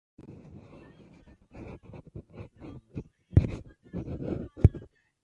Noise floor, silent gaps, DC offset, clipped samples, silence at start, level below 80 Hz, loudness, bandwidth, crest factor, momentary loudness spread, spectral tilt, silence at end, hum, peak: -56 dBFS; none; under 0.1%; under 0.1%; 0.25 s; -40 dBFS; -29 LUFS; 7 kHz; 28 dB; 25 LU; -10.5 dB/octave; 0.4 s; none; -4 dBFS